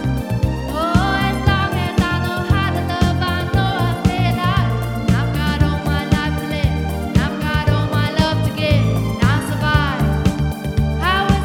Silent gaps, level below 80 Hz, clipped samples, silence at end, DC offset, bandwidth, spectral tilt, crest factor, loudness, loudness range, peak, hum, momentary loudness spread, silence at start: none; -26 dBFS; under 0.1%; 0 s; 0.1%; 17 kHz; -6.5 dB/octave; 18 dB; -18 LUFS; 1 LU; 0 dBFS; none; 4 LU; 0 s